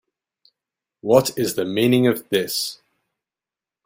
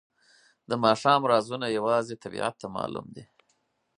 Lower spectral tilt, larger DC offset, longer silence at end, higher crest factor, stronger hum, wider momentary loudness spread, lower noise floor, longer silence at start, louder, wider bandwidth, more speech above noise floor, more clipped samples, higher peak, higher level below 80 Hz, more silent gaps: about the same, -4.5 dB/octave vs -5 dB/octave; neither; first, 1.1 s vs 0.75 s; about the same, 20 dB vs 24 dB; neither; second, 8 LU vs 14 LU; first, -90 dBFS vs -73 dBFS; first, 1.05 s vs 0.7 s; first, -20 LUFS vs -26 LUFS; first, 16.5 kHz vs 11 kHz; first, 71 dB vs 46 dB; neither; first, -2 dBFS vs -6 dBFS; first, -62 dBFS vs -68 dBFS; neither